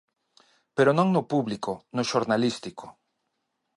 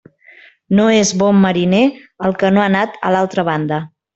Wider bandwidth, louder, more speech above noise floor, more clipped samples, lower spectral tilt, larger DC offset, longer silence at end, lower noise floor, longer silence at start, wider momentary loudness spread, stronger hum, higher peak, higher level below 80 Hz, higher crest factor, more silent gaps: first, 11.5 kHz vs 8.2 kHz; second, -25 LUFS vs -15 LUFS; first, 53 dB vs 31 dB; neither; about the same, -6 dB/octave vs -5.5 dB/octave; neither; first, 0.85 s vs 0.3 s; first, -78 dBFS vs -45 dBFS; about the same, 0.75 s vs 0.7 s; first, 15 LU vs 8 LU; neither; second, -8 dBFS vs -2 dBFS; second, -68 dBFS vs -52 dBFS; first, 20 dB vs 14 dB; neither